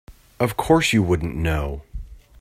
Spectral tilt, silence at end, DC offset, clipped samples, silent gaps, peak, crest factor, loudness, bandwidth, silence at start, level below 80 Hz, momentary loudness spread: -5.5 dB/octave; 0.25 s; under 0.1%; under 0.1%; none; -2 dBFS; 20 dB; -21 LUFS; 16 kHz; 0.1 s; -34 dBFS; 19 LU